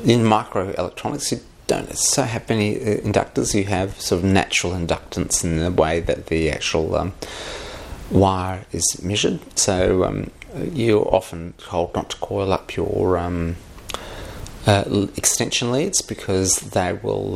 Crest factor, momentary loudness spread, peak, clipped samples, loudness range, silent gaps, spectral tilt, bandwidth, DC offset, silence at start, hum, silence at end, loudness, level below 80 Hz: 20 dB; 13 LU; 0 dBFS; under 0.1%; 3 LU; none; -4 dB/octave; 15.5 kHz; under 0.1%; 0 s; none; 0 s; -21 LUFS; -40 dBFS